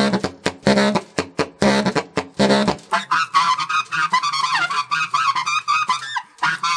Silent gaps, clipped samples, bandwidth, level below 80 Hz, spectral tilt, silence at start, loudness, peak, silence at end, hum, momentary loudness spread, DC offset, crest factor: none; under 0.1%; 10.5 kHz; -50 dBFS; -4 dB/octave; 0 s; -19 LUFS; 0 dBFS; 0 s; none; 7 LU; under 0.1%; 20 dB